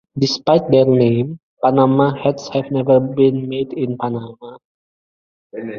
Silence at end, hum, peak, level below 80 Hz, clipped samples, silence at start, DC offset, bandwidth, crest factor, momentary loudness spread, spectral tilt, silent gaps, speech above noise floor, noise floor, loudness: 0 s; none; -2 dBFS; -56 dBFS; under 0.1%; 0.15 s; under 0.1%; 7.2 kHz; 16 dB; 12 LU; -7.5 dB/octave; 1.43-1.57 s, 4.65-5.50 s; over 74 dB; under -90 dBFS; -16 LUFS